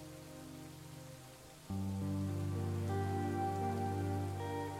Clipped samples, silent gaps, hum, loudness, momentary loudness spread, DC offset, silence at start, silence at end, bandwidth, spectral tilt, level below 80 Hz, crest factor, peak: under 0.1%; none; none; -39 LUFS; 14 LU; under 0.1%; 0 s; 0 s; 15.5 kHz; -7 dB/octave; -68 dBFS; 12 dB; -26 dBFS